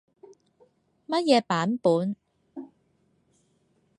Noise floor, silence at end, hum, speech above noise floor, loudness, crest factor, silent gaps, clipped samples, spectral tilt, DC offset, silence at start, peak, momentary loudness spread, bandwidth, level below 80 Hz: -68 dBFS; 1.3 s; none; 45 dB; -25 LUFS; 22 dB; none; under 0.1%; -5.5 dB/octave; under 0.1%; 1.1 s; -8 dBFS; 22 LU; 10.5 kHz; -78 dBFS